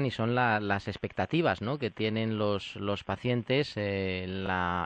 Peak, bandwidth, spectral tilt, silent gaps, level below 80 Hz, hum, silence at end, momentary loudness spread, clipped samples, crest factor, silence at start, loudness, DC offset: -12 dBFS; 8.8 kHz; -7 dB/octave; none; -62 dBFS; none; 0 s; 6 LU; under 0.1%; 18 dB; 0 s; -30 LUFS; under 0.1%